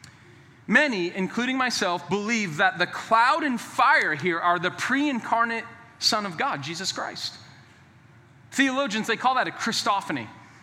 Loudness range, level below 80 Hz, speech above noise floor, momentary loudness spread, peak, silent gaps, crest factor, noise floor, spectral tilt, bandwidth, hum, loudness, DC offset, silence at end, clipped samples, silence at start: 5 LU; -74 dBFS; 28 dB; 11 LU; -6 dBFS; none; 20 dB; -53 dBFS; -3 dB/octave; 16 kHz; none; -24 LUFS; under 0.1%; 0.15 s; under 0.1%; 0.05 s